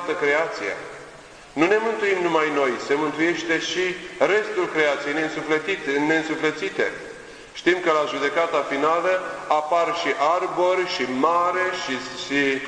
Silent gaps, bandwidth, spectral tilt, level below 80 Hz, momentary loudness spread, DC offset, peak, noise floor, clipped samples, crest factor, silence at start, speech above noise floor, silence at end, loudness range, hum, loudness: none; 10.5 kHz; -3.5 dB/octave; -62 dBFS; 7 LU; under 0.1%; -4 dBFS; -43 dBFS; under 0.1%; 20 dB; 0 s; 21 dB; 0 s; 2 LU; none; -22 LUFS